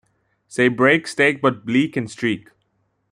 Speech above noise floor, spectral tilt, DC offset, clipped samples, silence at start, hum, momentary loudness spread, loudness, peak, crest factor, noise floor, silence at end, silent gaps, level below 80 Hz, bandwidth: 50 dB; -5.5 dB/octave; under 0.1%; under 0.1%; 0.5 s; none; 8 LU; -19 LUFS; -2 dBFS; 18 dB; -68 dBFS; 0.7 s; none; -64 dBFS; 11.5 kHz